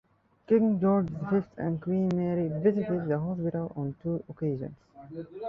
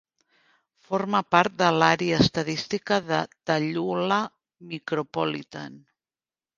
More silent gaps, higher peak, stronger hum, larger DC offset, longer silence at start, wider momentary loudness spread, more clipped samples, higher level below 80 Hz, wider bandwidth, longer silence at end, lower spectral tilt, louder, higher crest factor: neither; second, -12 dBFS vs -2 dBFS; neither; neither; second, 0.5 s vs 0.9 s; second, 11 LU vs 15 LU; neither; about the same, -62 dBFS vs -58 dBFS; second, 6 kHz vs 7.6 kHz; second, 0 s vs 0.8 s; first, -11 dB/octave vs -5 dB/octave; second, -29 LUFS vs -24 LUFS; second, 18 dB vs 24 dB